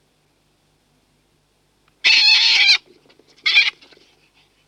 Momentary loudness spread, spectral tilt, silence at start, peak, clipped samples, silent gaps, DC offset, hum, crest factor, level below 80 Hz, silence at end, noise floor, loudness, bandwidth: 9 LU; 3.5 dB/octave; 2.05 s; -4 dBFS; under 0.1%; none; under 0.1%; 50 Hz at -70 dBFS; 16 dB; -70 dBFS; 0.95 s; -62 dBFS; -13 LUFS; 13.5 kHz